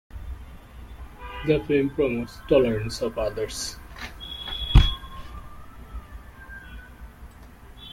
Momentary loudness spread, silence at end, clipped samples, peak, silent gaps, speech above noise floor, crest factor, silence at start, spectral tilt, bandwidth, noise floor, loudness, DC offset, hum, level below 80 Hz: 25 LU; 0 s; under 0.1%; -2 dBFS; none; 22 dB; 24 dB; 0.15 s; -5.5 dB/octave; 16 kHz; -46 dBFS; -25 LUFS; under 0.1%; none; -32 dBFS